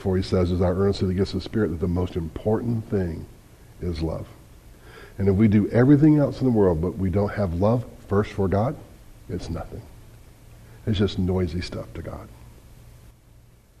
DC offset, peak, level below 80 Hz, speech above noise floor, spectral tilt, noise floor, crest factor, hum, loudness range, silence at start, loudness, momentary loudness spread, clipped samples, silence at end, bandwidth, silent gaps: under 0.1%; -6 dBFS; -42 dBFS; 30 dB; -8.5 dB/octave; -52 dBFS; 18 dB; none; 9 LU; 0 s; -23 LUFS; 17 LU; under 0.1%; 0.9 s; 13.5 kHz; none